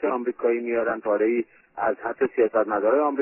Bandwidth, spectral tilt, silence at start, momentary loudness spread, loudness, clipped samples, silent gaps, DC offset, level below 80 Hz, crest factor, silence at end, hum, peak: 3 kHz; -10 dB/octave; 0 s; 6 LU; -24 LUFS; under 0.1%; none; under 0.1%; -66 dBFS; 14 dB; 0 s; none; -10 dBFS